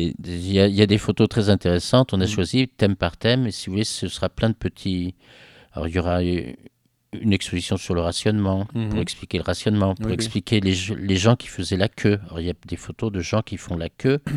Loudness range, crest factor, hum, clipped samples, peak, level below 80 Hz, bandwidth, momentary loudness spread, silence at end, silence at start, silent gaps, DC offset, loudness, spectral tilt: 6 LU; 22 dB; none; under 0.1%; 0 dBFS; -44 dBFS; 12.5 kHz; 10 LU; 0 s; 0 s; none; under 0.1%; -22 LUFS; -6 dB/octave